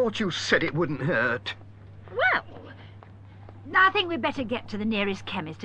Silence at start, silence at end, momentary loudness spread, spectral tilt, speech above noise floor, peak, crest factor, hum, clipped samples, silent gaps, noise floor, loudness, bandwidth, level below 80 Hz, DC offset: 0 s; 0 s; 22 LU; -5 dB/octave; 20 dB; -8 dBFS; 20 dB; none; under 0.1%; none; -46 dBFS; -25 LUFS; 9.6 kHz; -56 dBFS; under 0.1%